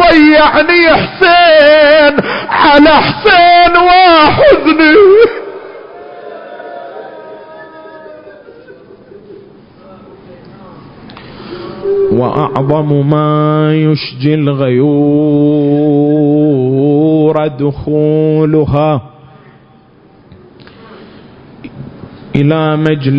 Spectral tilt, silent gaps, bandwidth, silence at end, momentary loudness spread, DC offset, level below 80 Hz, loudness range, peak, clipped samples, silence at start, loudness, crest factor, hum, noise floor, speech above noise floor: -8.5 dB/octave; none; 5.4 kHz; 0 s; 23 LU; under 0.1%; -38 dBFS; 17 LU; 0 dBFS; 0.1%; 0 s; -8 LUFS; 10 dB; none; -42 dBFS; 34 dB